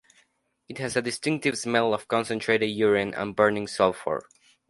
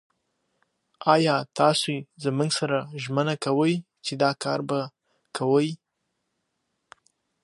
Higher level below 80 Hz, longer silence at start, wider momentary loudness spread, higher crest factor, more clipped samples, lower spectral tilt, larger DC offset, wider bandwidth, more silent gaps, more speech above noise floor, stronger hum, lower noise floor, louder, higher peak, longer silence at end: first, -62 dBFS vs -74 dBFS; second, 0.7 s vs 1 s; about the same, 8 LU vs 9 LU; about the same, 22 dB vs 22 dB; neither; about the same, -4.5 dB/octave vs -5 dB/octave; neither; about the same, 11.5 kHz vs 11.5 kHz; neither; second, 43 dB vs 54 dB; neither; second, -68 dBFS vs -78 dBFS; about the same, -25 LUFS vs -25 LUFS; about the same, -4 dBFS vs -4 dBFS; second, 0.5 s vs 1.7 s